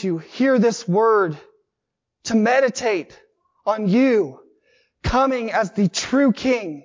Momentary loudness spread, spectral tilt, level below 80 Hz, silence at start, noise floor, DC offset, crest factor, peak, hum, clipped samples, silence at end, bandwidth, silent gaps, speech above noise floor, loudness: 10 LU; -5.5 dB/octave; -44 dBFS; 0 s; -81 dBFS; under 0.1%; 14 dB; -6 dBFS; none; under 0.1%; 0.05 s; 7.8 kHz; none; 62 dB; -20 LUFS